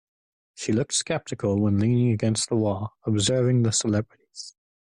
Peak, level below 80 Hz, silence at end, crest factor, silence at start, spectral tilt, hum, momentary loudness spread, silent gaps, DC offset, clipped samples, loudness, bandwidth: -10 dBFS; -58 dBFS; 0.4 s; 14 dB; 0.6 s; -5 dB/octave; none; 17 LU; none; under 0.1%; under 0.1%; -24 LUFS; 11 kHz